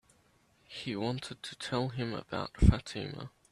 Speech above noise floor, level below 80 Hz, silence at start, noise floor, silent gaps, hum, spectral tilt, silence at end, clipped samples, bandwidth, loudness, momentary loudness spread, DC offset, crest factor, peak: 36 dB; -38 dBFS; 0.7 s; -68 dBFS; none; none; -6.5 dB/octave; 0.25 s; under 0.1%; 11.5 kHz; -34 LUFS; 15 LU; under 0.1%; 24 dB; -8 dBFS